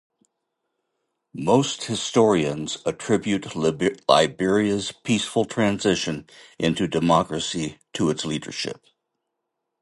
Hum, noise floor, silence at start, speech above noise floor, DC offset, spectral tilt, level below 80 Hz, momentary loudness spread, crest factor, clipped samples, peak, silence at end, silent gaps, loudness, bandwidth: none; -80 dBFS; 1.35 s; 58 dB; under 0.1%; -4.5 dB/octave; -54 dBFS; 11 LU; 22 dB; under 0.1%; -2 dBFS; 1.1 s; none; -23 LUFS; 11.5 kHz